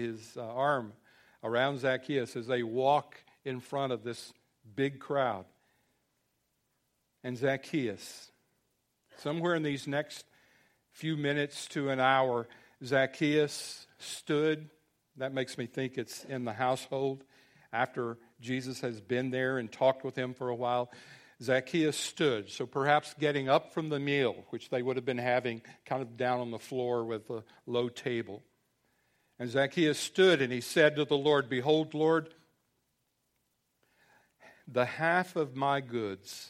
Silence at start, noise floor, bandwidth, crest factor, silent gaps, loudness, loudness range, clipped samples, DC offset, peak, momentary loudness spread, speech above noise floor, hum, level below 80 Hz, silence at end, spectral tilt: 0 s; -79 dBFS; 15.5 kHz; 22 dB; none; -32 LUFS; 8 LU; under 0.1%; under 0.1%; -10 dBFS; 14 LU; 47 dB; none; -76 dBFS; 0 s; -5 dB/octave